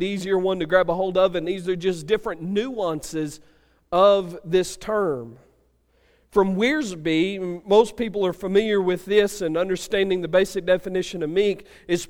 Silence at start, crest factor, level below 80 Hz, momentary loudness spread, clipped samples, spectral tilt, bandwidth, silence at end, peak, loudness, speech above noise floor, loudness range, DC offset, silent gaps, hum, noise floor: 0 s; 18 dB; -50 dBFS; 8 LU; under 0.1%; -5 dB/octave; 16.5 kHz; 0.05 s; -4 dBFS; -22 LUFS; 40 dB; 3 LU; under 0.1%; none; none; -62 dBFS